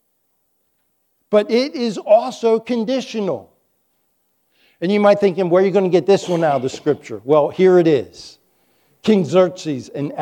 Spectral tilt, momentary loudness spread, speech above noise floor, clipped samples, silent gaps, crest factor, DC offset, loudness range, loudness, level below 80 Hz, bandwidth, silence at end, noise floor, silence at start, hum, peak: -6.5 dB/octave; 11 LU; 51 dB; under 0.1%; none; 16 dB; under 0.1%; 4 LU; -17 LUFS; -68 dBFS; 10 kHz; 0 s; -67 dBFS; 1.3 s; none; -2 dBFS